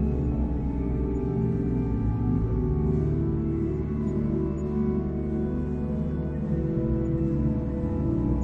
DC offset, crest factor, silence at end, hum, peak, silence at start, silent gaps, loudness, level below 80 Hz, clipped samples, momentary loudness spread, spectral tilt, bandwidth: under 0.1%; 12 dB; 0 s; none; -14 dBFS; 0 s; none; -27 LUFS; -32 dBFS; under 0.1%; 3 LU; -11.5 dB/octave; 6.6 kHz